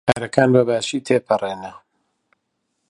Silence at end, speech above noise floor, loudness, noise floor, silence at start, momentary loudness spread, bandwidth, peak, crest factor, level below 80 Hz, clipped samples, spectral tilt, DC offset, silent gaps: 1.2 s; 55 dB; -19 LUFS; -73 dBFS; 0.05 s; 15 LU; 11.5 kHz; 0 dBFS; 20 dB; -56 dBFS; under 0.1%; -5.5 dB/octave; under 0.1%; none